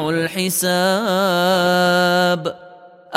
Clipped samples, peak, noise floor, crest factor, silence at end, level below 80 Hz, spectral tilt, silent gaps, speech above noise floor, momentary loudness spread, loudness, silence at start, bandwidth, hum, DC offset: under 0.1%; 0 dBFS; -42 dBFS; 18 dB; 0 s; -60 dBFS; -4 dB/octave; none; 25 dB; 5 LU; -17 LUFS; 0 s; 16 kHz; none; under 0.1%